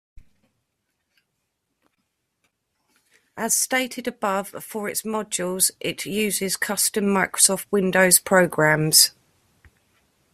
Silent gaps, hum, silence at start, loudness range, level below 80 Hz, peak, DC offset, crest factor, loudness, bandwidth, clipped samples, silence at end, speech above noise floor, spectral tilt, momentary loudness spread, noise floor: none; none; 3.35 s; 10 LU; -62 dBFS; 0 dBFS; under 0.1%; 24 dB; -20 LUFS; 16 kHz; under 0.1%; 1.25 s; 55 dB; -2.5 dB/octave; 13 LU; -76 dBFS